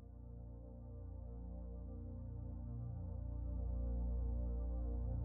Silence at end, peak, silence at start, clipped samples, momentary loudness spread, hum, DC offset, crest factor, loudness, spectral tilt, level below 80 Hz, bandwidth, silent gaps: 0 s; -32 dBFS; 0 s; under 0.1%; 11 LU; 60 Hz at -65 dBFS; under 0.1%; 10 dB; -47 LUFS; -13 dB/octave; -44 dBFS; 1.6 kHz; none